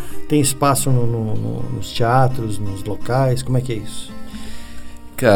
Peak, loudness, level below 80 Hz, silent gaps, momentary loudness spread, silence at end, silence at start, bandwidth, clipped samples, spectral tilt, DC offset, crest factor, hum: -2 dBFS; -19 LUFS; -38 dBFS; none; 18 LU; 0 s; 0 s; 18.5 kHz; under 0.1%; -5.5 dB/octave; under 0.1%; 16 dB; none